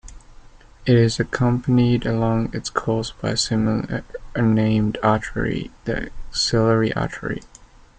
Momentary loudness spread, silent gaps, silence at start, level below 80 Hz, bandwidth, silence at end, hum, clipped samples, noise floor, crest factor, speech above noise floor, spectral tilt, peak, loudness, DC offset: 11 LU; none; 0.05 s; -40 dBFS; 9.4 kHz; 0.35 s; none; under 0.1%; -44 dBFS; 18 dB; 24 dB; -6 dB/octave; -2 dBFS; -21 LUFS; under 0.1%